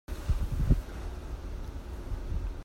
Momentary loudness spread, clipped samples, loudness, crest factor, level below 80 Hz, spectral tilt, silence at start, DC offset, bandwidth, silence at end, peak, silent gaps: 12 LU; under 0.1%; -36 LUFS; 20 dB; -34 dBFS; -7.5 dB/octave; 0.1 s; under 0.1%; 16 kHz; 0 s; -12 dBFS; none